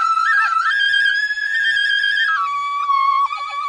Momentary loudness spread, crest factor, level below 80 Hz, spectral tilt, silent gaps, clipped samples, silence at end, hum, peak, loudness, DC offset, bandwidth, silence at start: 5 LU; 12 dB; -62 dBFS; 3.5 dB/octave; none; under 0.1%; 0 s; none; -6 dBFS; -16 LUFS; under 0.1%; 10.5 kHz; 0 s